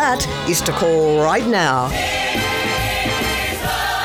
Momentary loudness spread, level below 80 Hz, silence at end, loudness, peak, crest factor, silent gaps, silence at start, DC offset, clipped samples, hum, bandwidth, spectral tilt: 4 LU; -34 dBFS; 0 s; -18 LUFS; -4 dBFS; 14 dB; none; 0 s; under 0.1%; under 0.1%; none; over 20 kHz; -3.5 dB/octave